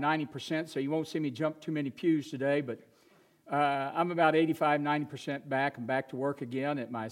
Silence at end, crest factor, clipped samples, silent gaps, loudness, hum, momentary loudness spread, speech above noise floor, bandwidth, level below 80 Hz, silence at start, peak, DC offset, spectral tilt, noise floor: 0 s; 20 dB; under 0.1%; none; -31 LUFS; none; 8 LU; 33 dB; 15 kHz; -82 dBFS; 0 s; -12 dBFS; under 0.1%; -6.5 dB/octave; -64 dBFS